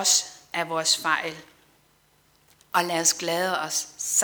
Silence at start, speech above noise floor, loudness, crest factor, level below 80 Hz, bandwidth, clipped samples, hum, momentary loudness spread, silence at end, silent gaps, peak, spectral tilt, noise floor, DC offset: 0 s; 38 dB; -24 LUFS; 22 dB; -72 dBFS; over 20 kHz; under 0.1%; none; 10 LU; 0 s; none; -6 dBFS; -0.5 dB/octave; -62 dBFS; under 0.1%